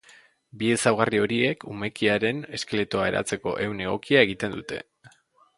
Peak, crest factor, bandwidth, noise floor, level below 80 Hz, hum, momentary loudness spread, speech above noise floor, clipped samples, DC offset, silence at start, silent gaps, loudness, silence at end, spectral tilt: -2 dBFS; 24 dB; 11.5 kHz; -59 dBFS; -58 dBFS; none; 11 LU; 34 dB; under 0.1%; under 0.1%; 0.55 s; none; -25 LUFS; 0.5 s; -4.5 dB/octave